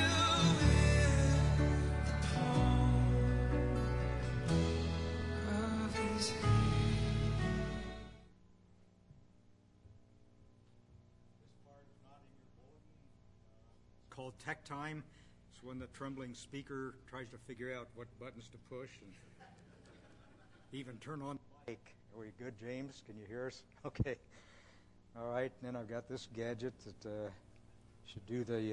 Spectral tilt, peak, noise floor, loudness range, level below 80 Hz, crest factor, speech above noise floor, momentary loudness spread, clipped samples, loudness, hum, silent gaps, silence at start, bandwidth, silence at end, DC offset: -5.5 dB/octave; -18 dBFS; -65 dBFS; 19 LU; -46 dBFS; 20 dB; 20 dB; 21 LU; under 0.1%; -36 LUFS; 60 Hz at -65 dBFS; none; 0 s; 11.5 kHz; 0 s; under 0.1%